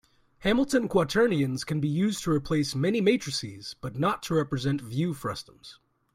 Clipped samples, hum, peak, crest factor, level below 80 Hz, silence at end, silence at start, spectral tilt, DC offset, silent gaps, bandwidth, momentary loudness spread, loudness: under 0.1%; none; -10 dBFS; 16 dB; -54 dBFS; 0.4 s; 0.4 s; -5.5 dB/octave; under 0.1%; none; 16 kHz; 11 LU; -27 LUFS